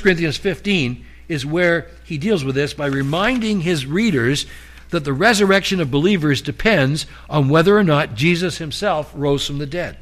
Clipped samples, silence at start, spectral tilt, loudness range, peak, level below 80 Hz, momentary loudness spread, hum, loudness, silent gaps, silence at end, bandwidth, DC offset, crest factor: under 0.1%; 0 s; -5.5 dB/octave; 4 LU; -4 dBFS; -40 dBFS; 10 LU; none; -18 LUFS; none; 0 s; 15 kHz; under 0.1%; 14 dB